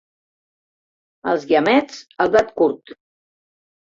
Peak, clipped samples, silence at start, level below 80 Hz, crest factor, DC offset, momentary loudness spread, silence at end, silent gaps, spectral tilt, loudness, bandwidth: -2 dBFS; under 0.1%; 1.25 s; -58 dBFS; 20 dB; under 0.1%; 15 LU; 0.85 s; none; -5 dB/octave; -18 LUFS; 7.8 kHz